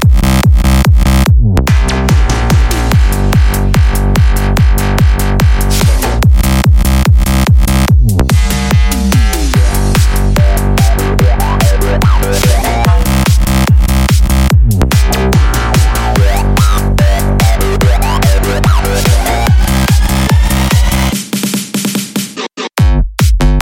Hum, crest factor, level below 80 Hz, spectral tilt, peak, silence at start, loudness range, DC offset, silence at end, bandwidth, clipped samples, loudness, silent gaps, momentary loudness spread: none; 8 dB; -10 dBFS; -5.5 dB/octave; 0 dBFS; 0 s; 1 LU; under 0.1%; 0 s; 17 kHz; under 0.1%; -10 LUFS; none; 2 LU